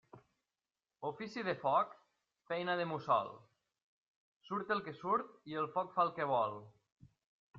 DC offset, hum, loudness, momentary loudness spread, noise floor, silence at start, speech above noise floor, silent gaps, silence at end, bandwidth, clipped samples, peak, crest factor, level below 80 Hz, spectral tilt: under 0.1%; none; -37 LUFS; 10 LU; under -90 dBFS; 0.15 s; over 53 dB; 3.82-4.41 s, 6.92-6.96 s, 7.26-7.54 s; 0 s; 7.4 kHz; under 0.1%; -20 dBFS; 20 dB; -82 dBFS; -3.5 dB/octave